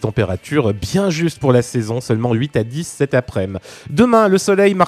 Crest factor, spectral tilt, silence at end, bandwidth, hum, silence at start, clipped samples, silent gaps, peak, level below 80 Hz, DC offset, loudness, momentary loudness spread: 16 dB; -6 dB/octave; 0 s; 13.5 kHz; none; 0 s; under 0.1%; none; 0 dBFS; -44 dBFS; under 0.1%; -17 LUFS; 10 LU